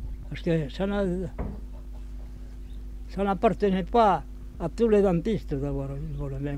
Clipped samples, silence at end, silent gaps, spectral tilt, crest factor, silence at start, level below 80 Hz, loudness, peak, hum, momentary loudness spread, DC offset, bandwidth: under 0.1%; 0 s; none; -8 dB/octave; 18 dB; 0 s; -38 dBFS; -27 LUFS; -8 dBFS; none; 20 LU; under 0.1%; 11 kHz